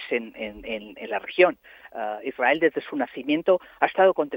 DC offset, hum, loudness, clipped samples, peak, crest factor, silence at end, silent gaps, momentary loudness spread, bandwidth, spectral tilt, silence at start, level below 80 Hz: under 0.1%; none; -24 LUFS; under 0.1%; -4 dBFS; 20 dB; 0 s; none; 13 LU; 16.5 kHz; -7 dB/octave; 0 s; -62 dBFS